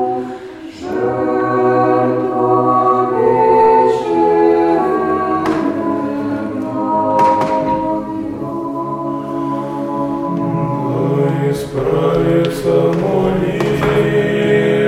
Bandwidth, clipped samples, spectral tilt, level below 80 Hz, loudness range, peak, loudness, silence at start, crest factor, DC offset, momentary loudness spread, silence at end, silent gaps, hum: 15.5 kHz; under 0.1%; -7.5 dB/octave; -44 dBFS; 6 LU; -2 dBFS; -15 LUFS; 0 s; 12 dB; under 0.1%; 9 LU; 0 s; none; none